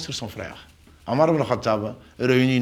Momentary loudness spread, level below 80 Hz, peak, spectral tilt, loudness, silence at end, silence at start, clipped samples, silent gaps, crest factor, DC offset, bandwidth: 16 LU; -54 dBFS; -4 dBFS; -6 dB/octave; -23 LUFS; 0 s; 0 s; under 0.1%; none; 18 dB; under 0.1%; 15 kHz